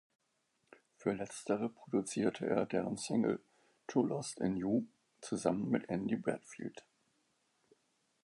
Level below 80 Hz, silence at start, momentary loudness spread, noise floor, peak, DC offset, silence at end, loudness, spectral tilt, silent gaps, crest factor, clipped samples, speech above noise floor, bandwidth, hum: -72 dBFS; 1 s; 10 LU; -80 dBFS; -16 dBFS; under 0.1%; 1.45 s; -37 LUFS; -6 dB/octave; none; 22 dB; under 0.1%; 44 dB; 11.5 kHz; none